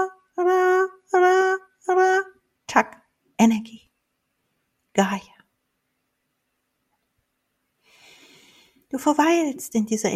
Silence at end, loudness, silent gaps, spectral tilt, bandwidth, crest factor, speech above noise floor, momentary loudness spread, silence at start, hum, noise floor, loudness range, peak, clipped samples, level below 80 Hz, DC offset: 0 s; -21 LUFS; none; -4.5 dB/octave; 14.5 kHz; 24 dB; 54 dB; 14 LU; 0 s; none; -75 dBFS; 10 LU; 0 dBFS; under 0.1%; -68 dBFS; under 0.1%